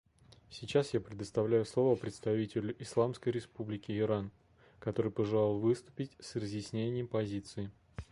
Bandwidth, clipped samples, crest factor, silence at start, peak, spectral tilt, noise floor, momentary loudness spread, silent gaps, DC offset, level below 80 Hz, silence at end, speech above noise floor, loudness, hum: 11.5 kHz; under 0.1%; 18 dB; 0.5 s; -16 dBFS; -7 dB/octave; -60 dBFS; 12 LU; none; under 0.1%; -62 dBFS; 0.1 s; 26 dB; -35 LUFS; none